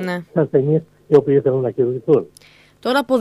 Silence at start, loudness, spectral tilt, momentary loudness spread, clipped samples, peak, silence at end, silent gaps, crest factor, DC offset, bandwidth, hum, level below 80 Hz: 0 s; -18 LUFS; -7.5 dB/octave; 7 LU; under 0.1%; 0 dBFS; 0 s; none; 18 dB; under 0.1%; 13 kHz; 50 Hz at -45 dBFS; -62 dBFS